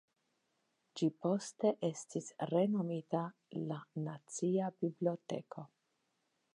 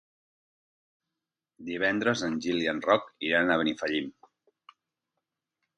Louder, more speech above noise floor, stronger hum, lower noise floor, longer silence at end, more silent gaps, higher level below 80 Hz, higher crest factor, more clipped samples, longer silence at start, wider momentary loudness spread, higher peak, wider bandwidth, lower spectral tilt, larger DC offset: second, -38 LUFS vs -28 LUFS; second, 45 dB vs 61 dB; neither; second, -82 dBFS vs -88 dBFS; second, 0.9 s vs 1.65 s; neither; second, under -90 dBFS vs -68 dBFS; about the same, 18 dB vs 22 dB; neither; second, 0.95 s vs 1.6 s; about the same, 10 LU vs 10 LU; second, -20 dBFS vs -8 dBFS; about the same, 11 kHz vs 10 kHz; first, -6.5 dB/octave vs -4.5 dB/octave; neither